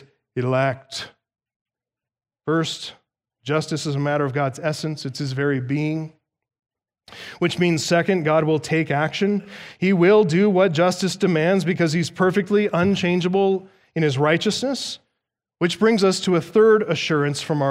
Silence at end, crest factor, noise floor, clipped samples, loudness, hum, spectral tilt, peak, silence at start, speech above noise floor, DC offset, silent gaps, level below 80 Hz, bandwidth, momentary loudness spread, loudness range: 0 s; 16 dB; under -90 dBFS; under 0.1%; -20 LUFS; none; -5.5 dB/octave; -6 dBFS; 0.35 s; over 70 dB; under 0.1%; 1.56-1.66 s; -64 dBFS; 14.5 kHz; 14 LU; 8 LU